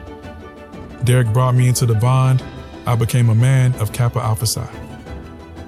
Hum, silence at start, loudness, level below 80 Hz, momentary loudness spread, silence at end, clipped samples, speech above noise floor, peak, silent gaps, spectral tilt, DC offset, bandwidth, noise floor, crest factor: none; 0 s; -16 LUFS; -42 dBFS; 21 LU; 0 s; under 0.1%; 20 dB; -4 dBFS; none; -6 dB/octave; under 0.1%; 15 kHz; -35 dBFS; 14 dB